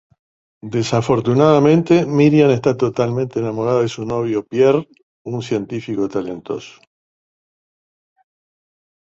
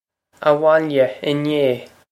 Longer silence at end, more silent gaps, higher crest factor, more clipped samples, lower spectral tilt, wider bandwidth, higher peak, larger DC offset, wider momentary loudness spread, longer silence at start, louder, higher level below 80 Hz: first, 2.45 s vs 0.25 s; first, 5.03-5.25 s vs none; about the same, 16 dB vs 18 dB; neither; about the same, -7 dB/octave vs -7 dB/octave; second, 8 kHz vs 13 kHz; about the same, -2 dBFS vs -2 dBFS; neither; first, 15 LU vs 7 LU; first, 0.65 s vs 0.4 s; about the same, -17 LUFS vs -18 LUFS; first, -54 dBFS vs -66 dBFS